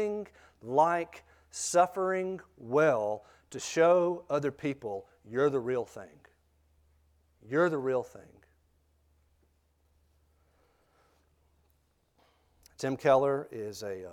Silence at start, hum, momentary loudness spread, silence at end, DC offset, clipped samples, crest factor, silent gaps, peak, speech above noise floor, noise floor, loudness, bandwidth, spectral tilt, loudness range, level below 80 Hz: 0 s; none; 17 LU; 0 s; under 0.1%; under 0.1%; 22 dB; none; -12 dBFS; 42 dB; -72 dBFS; -30 LUFS; 15.5 kHz; -5 dB/octave; 7 LU; -70 dBFS